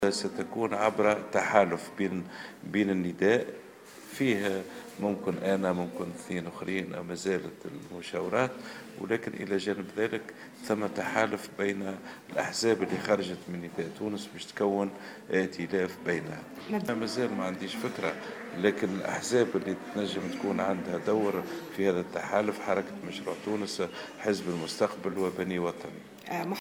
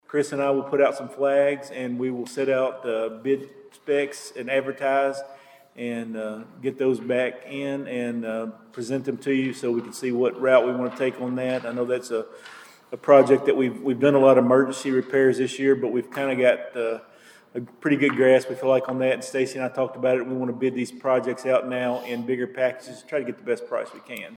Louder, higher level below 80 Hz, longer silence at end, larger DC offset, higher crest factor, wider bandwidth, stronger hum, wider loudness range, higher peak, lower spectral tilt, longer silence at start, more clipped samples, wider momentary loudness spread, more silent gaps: second, -31 LUFS vs -23 LUFS; first, -70 dBFS vs -78 dBFS; about the same, 0 s vs 0 s; neither; first, 26 dB vs 20 dB; first, 19 kHz vs 14.5 kHz; neither; second, 4 LU vs 7 LU; about the same, -6 dBFS vs -4 dBFS; about the same, -5 dB/octave vs -5.5 dB/octave; about the same, 0 s vs 0.1 s; neither; about the same, 11 LU vs 13 LU; neither